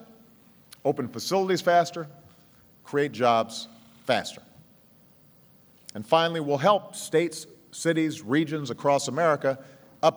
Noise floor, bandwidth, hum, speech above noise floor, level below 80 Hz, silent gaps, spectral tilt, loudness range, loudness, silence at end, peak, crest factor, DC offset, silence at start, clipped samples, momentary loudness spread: -56 dBFS; over 20 kHz; none; 31 dB; -76 dBFS; none; -4.5 dB/octave; 4 LU; -26 LUFS; 0 s; -6 dBFS; 20 dB; under 0.1%; 0 s; under 0.1%; 16 LU